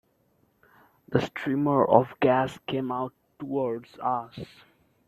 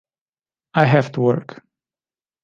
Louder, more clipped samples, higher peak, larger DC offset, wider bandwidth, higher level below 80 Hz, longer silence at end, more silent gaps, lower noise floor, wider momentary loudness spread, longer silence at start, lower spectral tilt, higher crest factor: second, -26 LUFS vs -18 LUFS; neither; about the same, -2 dBFS vs -2 dBFS; neither; first, 13 kHz vs 7.2 kHz; about the same, -64 dBFS vs -64 dBFS; second, 0.65 s vs 1 s; neither; second, -68 dBFS vs under -90 dBFS; first, 17 LU vs 9 LU; first, 1.1 s vs 0.75 s; about the same, -7.5 dB/octave vs -8 dB/octave; about the same, 24 dB vs 20 dB